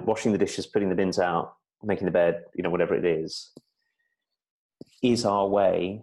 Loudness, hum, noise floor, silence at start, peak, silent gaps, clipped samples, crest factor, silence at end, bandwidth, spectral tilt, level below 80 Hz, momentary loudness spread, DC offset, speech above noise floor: -25 LUFS; none; -80 dBFS; 0 s; -10 dBFS; 4.50-4.69 s; under 0.1%; 16 dB; 0 s; 12 kHz; -5.5 dB/octave; -60 dBFS; 8 LU; under 0.1%; 55 dB